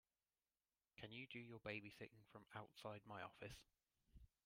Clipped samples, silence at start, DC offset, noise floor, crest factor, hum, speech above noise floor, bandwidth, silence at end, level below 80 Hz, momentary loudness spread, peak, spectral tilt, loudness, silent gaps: under 0.1%; 1 s; under 0.1%; under -90 dBFS; 24 dB; none; over 33 dB; 16 kHz; 0.2 s; -78 dBFS; 9 LU; -36 dBFS; -5 dB/octave; -57 LUFS; none